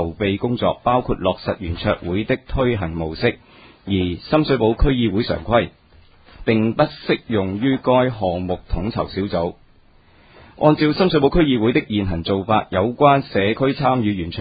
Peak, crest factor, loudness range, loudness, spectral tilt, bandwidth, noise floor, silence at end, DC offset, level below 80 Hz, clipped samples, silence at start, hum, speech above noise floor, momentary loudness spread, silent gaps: 0 dBFS; 18 dB; 4 LU; -19 LUFS; -11 dB/octave; 5 kHz; -51 dBFS; 0 s; under 0.1%; -34 dBFS; under 0.1%; 0 s; none; 33 dB; 8 LU; none